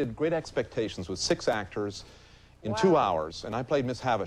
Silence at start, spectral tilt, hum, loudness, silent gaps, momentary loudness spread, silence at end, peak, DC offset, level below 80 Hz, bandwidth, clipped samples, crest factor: 0 s; -5 dB/octave; none; -29 LUFS; none; 11 LU; 0 s; -12 dBFS; under 0.1%; -54 dBFS; 12.5 kHz; under 0.1%; 18 dB